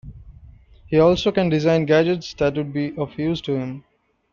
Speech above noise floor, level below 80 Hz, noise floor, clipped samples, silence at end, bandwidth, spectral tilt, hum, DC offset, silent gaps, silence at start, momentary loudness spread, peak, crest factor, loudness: 27 dB; -46 dBFS; -46 dBFS; under 0.1%; 0.5 s; 7.4 kHz; -7 dB/octave; none; under 0.1%; none; 0.05 s; 10 LU; -4 dBFS; 16 dB; -20 LUFS